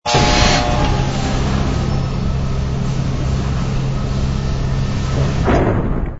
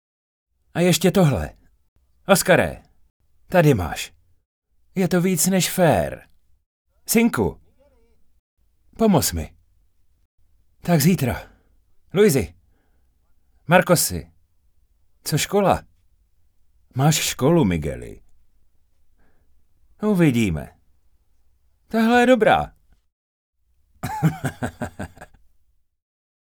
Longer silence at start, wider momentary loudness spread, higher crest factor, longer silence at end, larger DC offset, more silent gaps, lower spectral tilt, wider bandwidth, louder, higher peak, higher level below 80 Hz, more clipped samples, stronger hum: second, 0.05 s vs 0.75 s; second, 7 LU vs 18 LU; second, 16 dB vs 22 dB; second, 0 s vs 1.35 s; neither; second, none vs 1.88-1.96 s, 3.10-3.20 s, 4.45-4.62 s, 6.66-6.85 s, 8.39-8.57 s, 10.25-10.38 s, 23.12-23.53 s; about the same, -5.5 dB/octave vs -5 dB/octave; second, 8 kHz vs over 20 kHz; about the same, -18 LUFS vs -20 LUFS; about the same, 0 dBFS vs 0 dBFS; first, -22 dBFS vs -46 dBFS; neither; neither